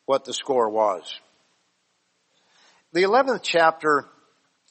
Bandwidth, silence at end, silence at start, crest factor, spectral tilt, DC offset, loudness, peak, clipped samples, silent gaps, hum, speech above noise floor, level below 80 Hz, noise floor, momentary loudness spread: 8.8 kHz; 0.7 s; 0.1 s; 20 dB; -3.5 dB/octave; under 0.1%; -22 LUFS; -4 dBFS; under 0.1%; none; none; 49 dB; -76 dBFS; -70 dBFS; 11 LU